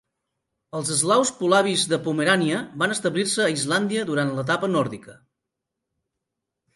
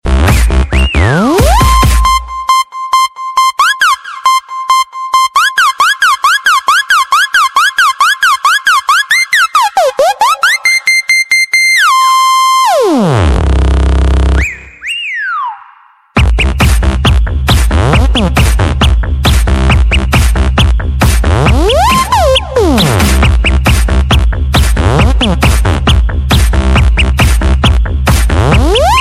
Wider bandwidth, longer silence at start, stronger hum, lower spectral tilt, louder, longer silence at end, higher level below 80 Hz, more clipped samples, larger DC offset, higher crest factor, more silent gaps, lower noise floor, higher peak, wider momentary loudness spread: second, 12 kHz vs 15.5 kHz; first, 0.75 s vs 0.05 s; neither; about the same, -3.5 dB/octave vs -4.5 dB/octave; second, -22 LUFS vs -9 LUFS; first, 1.65 s vs 0 s; second, -68 dBFS vs -12 dBFS; neither; neither; first, 20 dB vs 8 dB; neither; first, -83 dBFS vs -41 dBFS; second, -4 dBFS vs 0 dBFS; about the same, 6 LU vs 4 LU